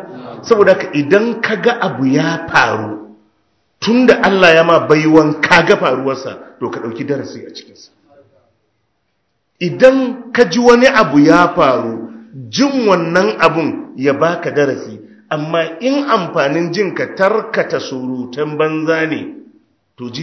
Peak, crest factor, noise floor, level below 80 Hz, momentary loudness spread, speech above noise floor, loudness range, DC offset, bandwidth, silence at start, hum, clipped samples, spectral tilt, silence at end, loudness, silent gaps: 0 dBFS; 14 dB; -67 dBFS; -52 dBFS; 16 LU; 54 dB; 7 LU; under 0.1%; 8 kHz; 0 s; none; 0.6%; -5.5 dB/octave; 0 s; -13 LUFS; none